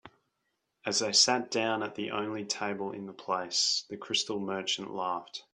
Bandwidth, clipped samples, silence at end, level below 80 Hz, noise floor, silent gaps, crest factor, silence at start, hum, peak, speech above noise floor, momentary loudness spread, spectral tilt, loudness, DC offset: 11.5 kHz; under 0.1%; 0.15 s; -76 dBFS; -81 dBFS; none; 22 dB; 0.05 s; none; -10 dBFS; 49 dB; 12 LU; -1.5 dB/octave; -30 LUFS; under 0.1%